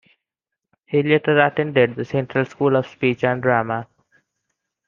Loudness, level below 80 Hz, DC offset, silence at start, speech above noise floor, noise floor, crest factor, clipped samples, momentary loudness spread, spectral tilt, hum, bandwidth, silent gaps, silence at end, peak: -19 LUFS; -62 dBFS; under 0.1%; 0.9 s; 65 dB; -84 dBFS; 18 dB; under 0.1%; 7 LU; -8 dB/octave; none; 7.2 kHz; none; 1.05 s; -2 dBFS